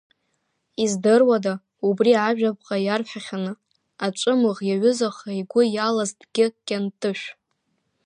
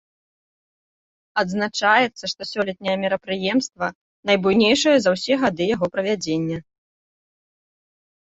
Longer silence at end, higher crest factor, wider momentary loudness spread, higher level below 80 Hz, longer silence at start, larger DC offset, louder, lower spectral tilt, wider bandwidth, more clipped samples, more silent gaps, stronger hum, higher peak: second, 0.75 s vs 1.7 s; about the same, 18 dB vs 20 dB; about the same, 12 LU vs 11 LU; second, -74 dBFS vs -60 dBFS; second, 0.8 s vs 1.35 s; neither; about the same, -22 LUFS vs -21 LUFS; about the same, -5 dB/octave vs -4 dB/octave; first, 10.5 kHz vs 8.2 kHz; neither; second, none vs 3.95-4.23 s; neither; about the same, -6 dBFS vs -4 dBFS